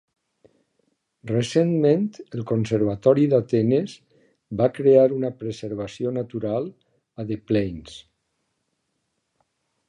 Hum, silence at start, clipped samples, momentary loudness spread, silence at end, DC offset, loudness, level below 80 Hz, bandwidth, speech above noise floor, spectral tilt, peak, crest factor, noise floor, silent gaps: none; 1.25 s; under 0.1%; 17 LU; 1.9 s; under 0.1%; -22 LUFS; -56 dBFS; 10.5 kHz; 54 dB; -7.5 dB/octave; -4 dBFS; 20 dB; -75 dBFS; none